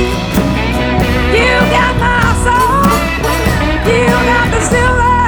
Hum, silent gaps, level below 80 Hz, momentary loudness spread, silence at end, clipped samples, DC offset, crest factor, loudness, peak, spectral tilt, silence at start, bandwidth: none; none; -20 dBFS; 4 LU; 0 s; under 0.1%; under 0.1%; 10 dB; -11 LUFS; 0 dBFS; -5 dB/octave; 0 s; over 20 kHz